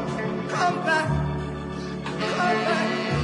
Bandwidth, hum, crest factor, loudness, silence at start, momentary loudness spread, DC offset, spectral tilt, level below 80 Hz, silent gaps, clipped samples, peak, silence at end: 11 kHz; none; 14 dB; -25 LUFS; 0 s; 9 LU; under 0.1%; -5.5 dB/octave; -44 dBFS; none; under 0.1%; -10 dBFS; 0 s